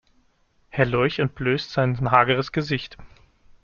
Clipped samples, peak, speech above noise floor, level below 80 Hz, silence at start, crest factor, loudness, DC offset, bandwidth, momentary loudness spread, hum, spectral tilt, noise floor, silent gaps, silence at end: under 0.1%; -2 dBFS; 41 dB; -48 dBFS; 0.75 s; 22 dB; -22 LUFS; under 0.1%; 7 kHz; 10 LU; none; -7 dB/octave; -63 dBFS; none; 0.55 s